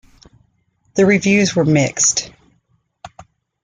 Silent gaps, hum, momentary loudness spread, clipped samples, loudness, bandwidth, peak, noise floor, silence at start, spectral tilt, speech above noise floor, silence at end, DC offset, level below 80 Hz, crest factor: none; none; 10 LU; under 0.1%; -15 LUFS; 9.8 kHz; -2 dBFS; -63 dBFS; 0.95 s; -4 dB/octave; 48 dB; 0.4 s; under 0.1%; -52 dBFS; 16 dB